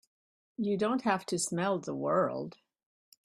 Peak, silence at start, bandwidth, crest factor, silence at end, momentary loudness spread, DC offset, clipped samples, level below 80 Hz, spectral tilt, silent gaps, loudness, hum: -14 dBFS; 0.6 s; 15.5 kHz; 20 dB; 0.75 s; 10 LU; under 0.1%; under 0.1%; -76 dBFS; -4.5 dB/octave; none; -32 LUFS; none